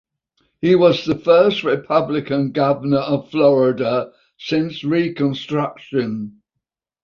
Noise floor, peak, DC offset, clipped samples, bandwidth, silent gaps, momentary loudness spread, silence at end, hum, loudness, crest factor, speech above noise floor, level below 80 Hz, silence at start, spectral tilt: -80 dBFS; -2 dBFS; under 0.1%; under 0.1%; 7 kHz; none; 9 LU; 0.75 s; none; -18 LUFS; 16 dB; 63 dB; -58 dBFS; 0.6 s; -7.5 dB/octave